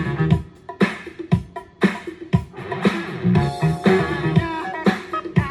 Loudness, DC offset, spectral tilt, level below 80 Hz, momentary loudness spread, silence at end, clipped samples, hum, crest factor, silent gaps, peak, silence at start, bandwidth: -21 LUFS; under 0.1%; -7.5 dB/octave; -42 dBFS; 8 LU; 0 s; under 0.1%; none; 18 dB; none; -4 dBFS; 0 s; 12.5 kHz